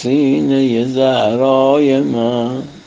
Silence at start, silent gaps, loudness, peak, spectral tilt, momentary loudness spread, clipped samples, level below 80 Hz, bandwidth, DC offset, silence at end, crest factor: 0 s; none; -14 LUFS; 0 dBFS; -7 dB/octave; 5 LU; under 0.1%; -56 dBFS; 7.6 kHz; under 0.1%; 0.05 s; 12 dB